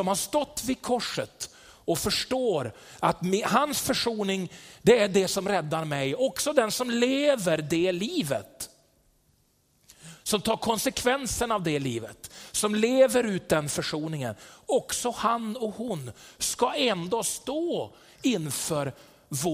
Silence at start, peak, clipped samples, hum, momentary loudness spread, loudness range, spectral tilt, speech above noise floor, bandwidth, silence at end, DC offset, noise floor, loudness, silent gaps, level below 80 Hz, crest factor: 0 s; -6 dBFS; under 0.1%; none; 12 LU; 4 LU; -4 dB/octave; 40 dB; 16 kHz; 0 s; under 0.1%; -67 dBFS; -27 LUFS; none; -56 dBFS; 20 dB